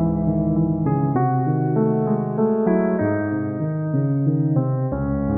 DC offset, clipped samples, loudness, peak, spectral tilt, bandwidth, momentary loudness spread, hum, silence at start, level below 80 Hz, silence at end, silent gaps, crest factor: under 0.1%; under 0.1%; -21 LUFS; -6 dBFS; -14.5 dB/octave; 2.5 kHz; 4 LU; none; 0 s; -40 dBFS; 0 s; none; 14 dB